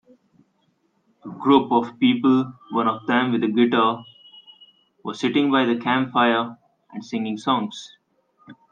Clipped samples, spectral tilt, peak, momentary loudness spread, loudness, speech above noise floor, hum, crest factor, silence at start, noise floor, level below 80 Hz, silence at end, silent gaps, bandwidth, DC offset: under 0.1%; -6 dB/octave; -2 dBFS; 16 LU; -21 LUFS; 46 dB; none; 20 dB; 1.25 s; -67 dBFS; -70 dBFS; 0.2 s; none; 7.4 kHz; under 0.1%